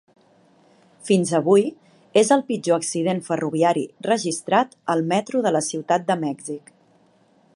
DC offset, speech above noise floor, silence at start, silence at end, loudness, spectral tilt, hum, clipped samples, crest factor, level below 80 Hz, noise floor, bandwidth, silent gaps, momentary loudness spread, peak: under 0.1%; 38 dB; 1.05 s; 1 s; -21 LUFS; -5 dB/octave; none; under 0.1%; 18 dB; -74 dBFS; -58 dBFS; 11.5 kHz; none; 9 LU; -4 dBFS